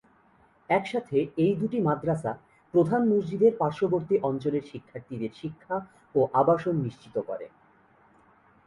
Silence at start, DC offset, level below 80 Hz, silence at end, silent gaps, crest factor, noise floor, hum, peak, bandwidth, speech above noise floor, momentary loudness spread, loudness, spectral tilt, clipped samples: 0.7 s; under 0.1%; -64 dBFS; 1.2 s; none; 18 dB; -61 dBFS; none; -10 dBFS; 11 kHz; 35 dB; 14 LU; -27 LUFS; -8.5 dB/octave; under 0.1%